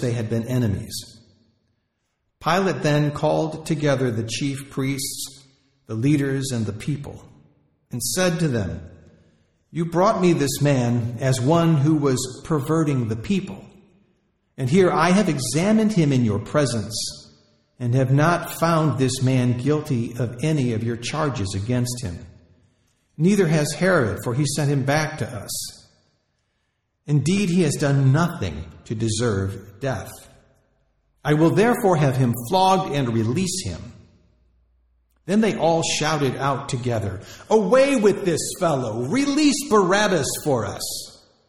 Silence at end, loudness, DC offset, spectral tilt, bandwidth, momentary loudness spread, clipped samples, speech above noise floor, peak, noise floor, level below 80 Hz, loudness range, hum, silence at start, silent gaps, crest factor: 0.35 s; -21 LUFS; 0.2%; -5.5 dB/octave; 15 kHz; 12 LU; under 0.1%; 53 dB; -6 dBFS; -73 dBFS; -52 dBFS; 5 LU; none; 0 s; none; 16 dB